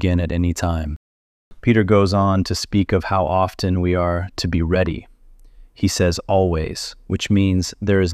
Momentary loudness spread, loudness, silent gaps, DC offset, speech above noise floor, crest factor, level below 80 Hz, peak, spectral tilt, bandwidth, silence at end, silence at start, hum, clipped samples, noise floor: 9 LU; -19 LUFS; 0.96-1.51 s; under 0.1%; 26 dB; 14 dB; -34 dBFS; -4 dBFS; -6 dB/octave; 14.5 kHz; 0 s; 0 s; none; under 0.1%; -45 dBFS